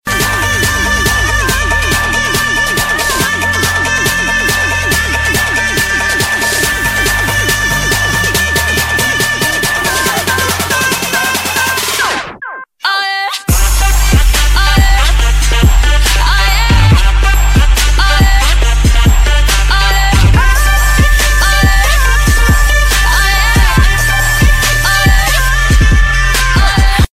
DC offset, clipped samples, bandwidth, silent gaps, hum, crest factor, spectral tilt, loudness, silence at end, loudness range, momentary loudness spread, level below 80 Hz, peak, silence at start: under 0.1%; under 0.1%; 16.5 kHz; none; none; 10 dB; -3 dB/octave; -10 LUFS; 0.05 s; 2 LU; 3 LU; -12 dBFS; 0 dBFS; 0.05 s